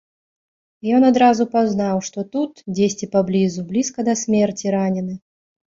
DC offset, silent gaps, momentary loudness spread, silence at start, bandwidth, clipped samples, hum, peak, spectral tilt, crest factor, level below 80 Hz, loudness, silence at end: under 0.1%; none; 10 LU; 0.85 s; 7.8 kHz; under 0.1%; none; -4 dBFS; -5.5 dB/octave; 16 dB; -60 dBFS; -19 LUFS; 0.6 s